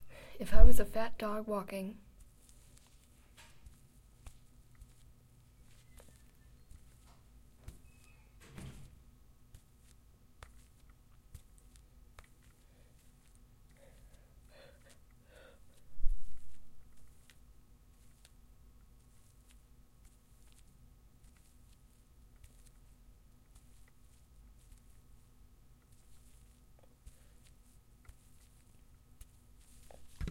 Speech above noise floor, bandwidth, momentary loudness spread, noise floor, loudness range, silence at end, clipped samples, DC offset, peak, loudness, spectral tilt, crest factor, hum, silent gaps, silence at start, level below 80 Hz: 43 dB; 13.5 kHz; 22 LU; -62 dBFS; 18 LU; 0 s; under 0.1%; under 0.1%; -6 dBFS; -37 LUFS; -6 dB/octave; 26 dB; none; none; 0.4 s; -40 dBFS